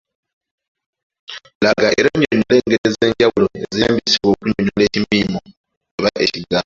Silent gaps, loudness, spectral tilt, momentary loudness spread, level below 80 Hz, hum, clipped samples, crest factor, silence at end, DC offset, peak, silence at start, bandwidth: 1.55-1.60 s, 2.78-2.84 s, 5.57-5.64 s, 5.77-5.81 s, 5.91-5.98 s; -16 LUFS; -5 dB/octave; 9 LU; -46 dBFS; none; under 0.1%; 16 dB; 0.05 s; under 0.1%; 0 dBFS; 1.3 s; 7.6 kHz